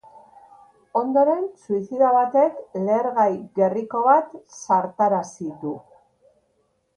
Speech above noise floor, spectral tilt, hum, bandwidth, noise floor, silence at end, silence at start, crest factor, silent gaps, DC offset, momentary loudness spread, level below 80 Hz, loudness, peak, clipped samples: 47 dB; -7 dB/octave; none; 9.8 kHz; -68 dBFS; 1.15 s; 0.15 s; 18 dB; none; under 0.1%; 14 LU; -70 dBFS; -21 LUFS; -4 dBFS; under 0.1%